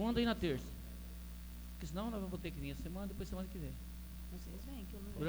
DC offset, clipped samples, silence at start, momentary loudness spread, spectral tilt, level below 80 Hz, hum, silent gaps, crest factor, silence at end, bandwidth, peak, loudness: under 0.1%; under 0.1%; 0 s; 13 LU; -6 dB/octave; -48 dBFS; 60 Hz at -50 dBFS; none; 20 dB; 0 s; over 20 kHz; -22 dBFS; -44 LUFS